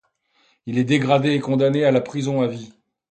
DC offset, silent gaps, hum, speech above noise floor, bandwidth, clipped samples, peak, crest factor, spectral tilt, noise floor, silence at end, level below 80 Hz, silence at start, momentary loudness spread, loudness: under 0.1%; none; none; 44 dB; 9 kHz; under 0.1%; -2 dBFS; 18 dB; -7 dB/octave; -63 dBFS; 0.45 s; -62 dBFS; 0.65 s; 9 LU; -20 LUFS